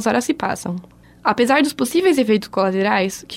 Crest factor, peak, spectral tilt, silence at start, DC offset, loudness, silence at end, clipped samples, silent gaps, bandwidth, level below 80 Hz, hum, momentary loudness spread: 16 dB; -2 dBFS; -4.5 dB/octave; 0 s; under 0.1%; -18 LUFS; 0 s; under 0.1%; none; 16 kHz; -56 dBFS; none; 8 LU